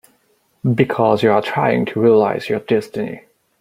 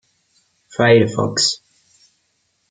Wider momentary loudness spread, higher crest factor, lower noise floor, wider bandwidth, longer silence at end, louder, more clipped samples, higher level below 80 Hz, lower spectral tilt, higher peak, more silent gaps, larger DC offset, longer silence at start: second, 12 LU vs 16 LU; about the same, 16 dB vs 20 dB; second, -61 dBFS vs -67 dBFS; first, 15 kHz vs 9.6 kHz; second, 0.4 s vs 1.15 s; about the same, -17 LUFS vs -15 LUFS; neither; about the same, -58 dBFS vs -58 dBFS; first, -7.5 dB/octave vs -4 dB/octave; about the same, -2 dBFS vs 0 dBFS; neither; neither; about the same, 0.65 s vs 0.75 s